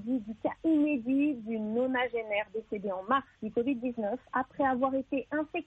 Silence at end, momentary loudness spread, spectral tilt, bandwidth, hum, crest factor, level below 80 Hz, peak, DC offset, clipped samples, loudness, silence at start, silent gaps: 0.05 s; 8 LU; -8 dB/octave; 4 kHz; none; 16 dB; -66 dBFS; -14 dBFS; under 0.1%; under 0.1%; -31 LUFS; 0 s; none